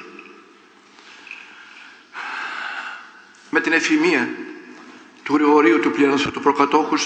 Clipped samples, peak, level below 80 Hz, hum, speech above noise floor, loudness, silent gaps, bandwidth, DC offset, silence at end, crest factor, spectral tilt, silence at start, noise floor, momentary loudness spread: under 0.1%; 0 dBFS; -64 dBFS; none; 32 dB; -18 LUFS; none; 8.8 kHz; under 0.1%; 0 s; 20 dB; -3.5 dB/octave; 0 s; -49 dBFS; 24 LU